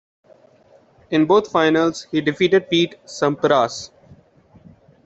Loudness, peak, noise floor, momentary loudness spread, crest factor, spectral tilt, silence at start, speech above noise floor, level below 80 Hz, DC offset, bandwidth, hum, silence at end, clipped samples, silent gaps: -18 LUFS; -2 dBFS; -53 dBFS; 8 LU; 18 dB; -5 dB/octave; 1.1 s; 35 dB; -60 dBFS; under 0.1%; 8 kHz; none; 1.2 s; under 0.1%; none